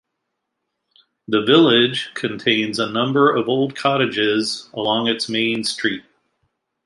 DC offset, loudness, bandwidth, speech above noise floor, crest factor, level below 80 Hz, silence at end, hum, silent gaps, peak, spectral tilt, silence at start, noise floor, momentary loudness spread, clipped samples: under 0.1%; -18 LUFS; 11.5 kHz; 59 dB; 18 dB; -64 dBFS; 0.85 s; none; none; -2 dBFS; -4.5 dB/octave; 1.3 s; -77 dBFS; 10 LU; under 0.1%